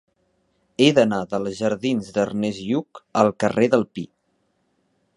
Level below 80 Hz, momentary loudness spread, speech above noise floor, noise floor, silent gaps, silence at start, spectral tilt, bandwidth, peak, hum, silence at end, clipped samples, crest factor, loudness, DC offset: -60 dBFS; 12 LU; 48 dB; -69 dBFS; none; 0.8 s; -5.5 dB/octave; 11 kHz; 0 dBFS; none; 1.1 s; under 0.1%; 22 dB; -21 LUFS; under 0.1%